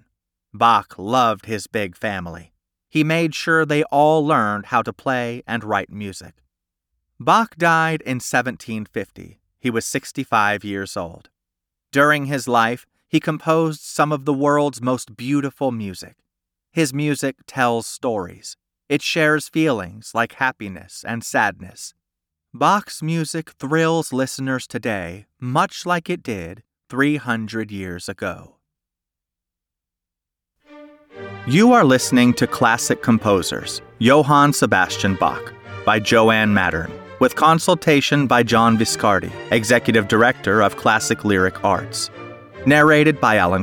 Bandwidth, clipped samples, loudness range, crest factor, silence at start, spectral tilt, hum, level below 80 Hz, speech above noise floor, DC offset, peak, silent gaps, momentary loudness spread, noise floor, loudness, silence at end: 18.5 kHz; under 0.1%; 7 LU; 16 dB; 0.55 s; -5 dB/octave; none; -54 dBFS; 67 dB; under 0.1%; -2 dBFS; none; 15 LU; -85 dBFS; -18 LUFS; 0 s